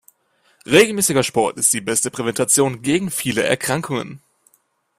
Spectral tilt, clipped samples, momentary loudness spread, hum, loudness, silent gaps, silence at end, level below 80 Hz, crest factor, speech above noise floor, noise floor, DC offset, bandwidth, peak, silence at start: -3 dB/octave; under 0.1%; 8 LU; none; -18 LUFS; none; 0.8 s; -56 dBFS; 20 dB; 45 dB; -63 dBFS; under 0.1%; 16 kHz; 0 dBFS; 0.7 s